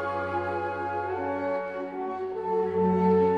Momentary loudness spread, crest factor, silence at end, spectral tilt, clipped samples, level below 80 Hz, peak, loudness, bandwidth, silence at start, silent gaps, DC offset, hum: 10 LU; 14 dB; 0 s; -9 dB/octave; under 0.1%; -62 dBFS; -12 dBFS; -28 LUFS; 6 kHz; 0 s; none; under 0.1%; none